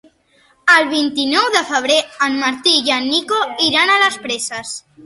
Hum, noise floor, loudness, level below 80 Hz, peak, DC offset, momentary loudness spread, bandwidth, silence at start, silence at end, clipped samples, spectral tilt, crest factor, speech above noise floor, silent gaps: none; -55 dBFS; -14 LUFS; -60 dBFS; 0 dBFS; under 0.1%; 10 LU; 12 kHz; 0.65 s; 0.25 s; under 0.1%; -1 dB/octave; 16 dB; 39 dB; none